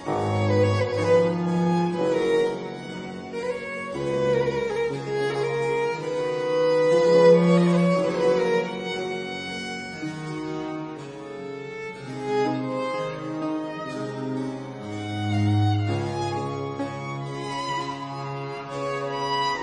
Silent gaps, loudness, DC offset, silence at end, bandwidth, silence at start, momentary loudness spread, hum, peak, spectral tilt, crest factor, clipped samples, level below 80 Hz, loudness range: none; -25 LUFS; under 0.1%; 0 s; 10 kHz; 0 s; 13 LU; none; -6 dBFS; -6.5 dB/octave; 18 dB; under 0.1%; -58 dBFS; 9 LU